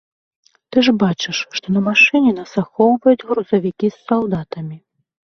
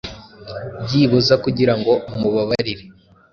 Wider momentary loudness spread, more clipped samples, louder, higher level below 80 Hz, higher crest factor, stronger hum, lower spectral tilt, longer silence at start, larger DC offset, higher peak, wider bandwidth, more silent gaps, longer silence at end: second, 12 LU vs 18 LU; neither; about the same, -16 LUFS vs -18 LUFS; second, -56 dBFS vs -48 dBFS; about the same, 16 dB vs 16 dB; neither; about the same, -5.5 dB/octave vs -6.5 dB/octave; first, 0.7 s vs 0.05 s; neither; about the same, -2 dBFS vs -2 dBFS; about the same, 6.6 kHz vs 7.2 kHz; neither; first, 0.55 s vs 0.4 s